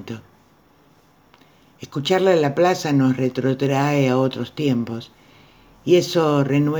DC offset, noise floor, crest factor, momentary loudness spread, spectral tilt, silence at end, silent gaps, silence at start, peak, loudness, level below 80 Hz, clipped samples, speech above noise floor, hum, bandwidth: under 0.1%; -55 dBFS; 16 dB; 14 LU; -6.5 dB/octave; 0 s; none; 0 s; -4 dBFS; -19 LUFS; -62 dBFS; under 0.1%; 36 dB; none; over 20 kHz